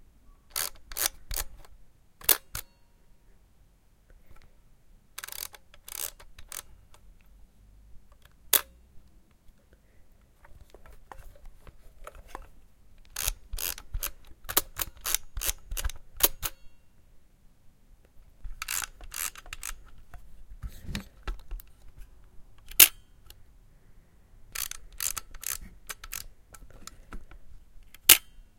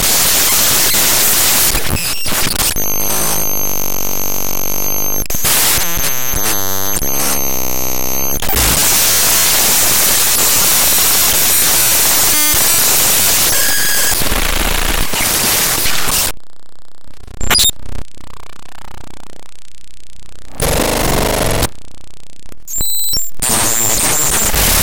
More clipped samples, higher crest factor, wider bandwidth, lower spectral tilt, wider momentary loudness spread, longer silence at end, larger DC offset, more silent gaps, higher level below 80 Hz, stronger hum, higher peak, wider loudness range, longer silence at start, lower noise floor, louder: neither; first, 34 dB vs 12 dB; about the same, 17 kHz vs 17 kHz; about the same, 0 dB/octave vs -1 dB/octave; first, 26 LU vs 8 LU; first, 0.15 s vs 0 s; neither; neither; second, -46 dBFS vs -26 dBFS; neither; about the same, 0 dBFS vs 0 dBFS; first, 15 LU vs 10 LU; first, 0.3 s vs 0 s; first, -60 dBFS vs -48 dBFS; second, -27 LUFS vs -11 LUFS